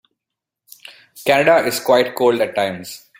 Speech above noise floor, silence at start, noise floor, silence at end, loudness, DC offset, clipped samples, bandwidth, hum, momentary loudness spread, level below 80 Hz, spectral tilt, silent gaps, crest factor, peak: 67 dB; 1.15 s; -83 dBFS; 0.2 s; -16 LUFS; under 0.1%; under 0.1%; 17 kHz; none; 10 LU; -62 dBFS; -4 dB/octave; none; 18 dB; -2 dBFS